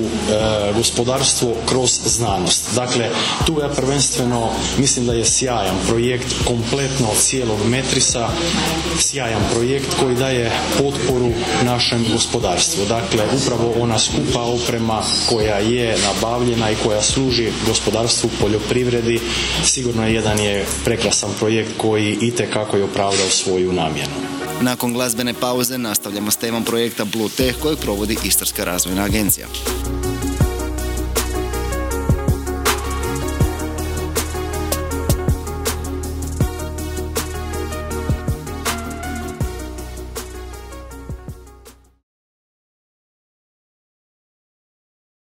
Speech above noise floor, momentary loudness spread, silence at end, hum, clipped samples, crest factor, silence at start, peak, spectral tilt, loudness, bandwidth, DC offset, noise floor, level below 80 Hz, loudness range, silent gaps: 27 dB; 9 LU; 3.55 s; none; under 0.1%; 16 dB; 0 s; -4 dBFS; -3.5 dB/octave; -18 LUFS; 19 kHz; under 0.1%; -45 dBFS; -30 dBFS; 7 LU; none